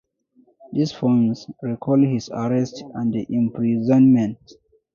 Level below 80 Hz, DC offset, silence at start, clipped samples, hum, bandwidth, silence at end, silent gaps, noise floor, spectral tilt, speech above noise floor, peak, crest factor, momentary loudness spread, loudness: -60 dBFS; under 0.1%; 0.7 s; under 0.1%; none; 7.2 kHz; 0.6 s; none; -59 dBFS; -8 dB/octave; 39 dB; -6 dBFS; 16 dB; 13 LU; -20 LUFS